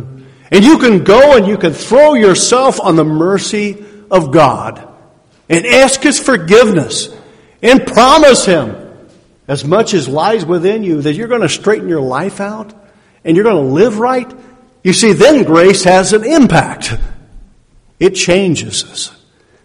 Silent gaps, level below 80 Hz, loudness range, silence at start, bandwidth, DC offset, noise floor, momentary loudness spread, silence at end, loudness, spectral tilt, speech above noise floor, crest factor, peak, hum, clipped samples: none; -36 dBFS; 6 LU; 0 s; 13 kHz; under 0.1%; -46 dBFS; 14 LU; 0.55 s; -9 LUFS; -4.5 dB/octave; 37 dB; 10 dB; 0 dBFS; none; 1%